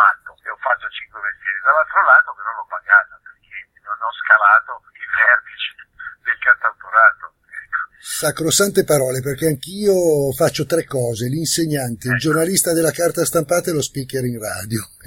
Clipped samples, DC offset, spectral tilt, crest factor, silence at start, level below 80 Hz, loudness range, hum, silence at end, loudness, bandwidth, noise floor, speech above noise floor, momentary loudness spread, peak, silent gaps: under 0.1%; under 0.1%; -3.5 dB/octave; 18 dB; 0 s; -54 dBFS; 3 LU; none; 0.2 s; -17 LUFS; 17 kHz; -43 dBFS; 25 dB; 16 LU; 0 dBFS; none